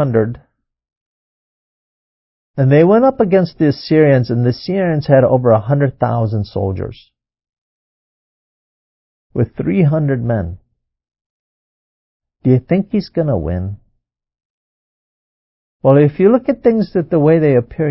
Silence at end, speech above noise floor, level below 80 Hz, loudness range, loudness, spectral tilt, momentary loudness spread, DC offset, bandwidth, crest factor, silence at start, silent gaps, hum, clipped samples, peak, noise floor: 0 s; 52 dB; -40 dBFS; 9 LU; -14 LUFS; -12.5 dB/octave; 10 LU; under 0.1%; 5.8 kHz; 16 dB; 0 s; 0.97-2.54 s, 7.49-9.30 s, 11.26-12.20 s, 14.45-15.80 s; none; under 0.1%; 0 dBFS; -65 dBFS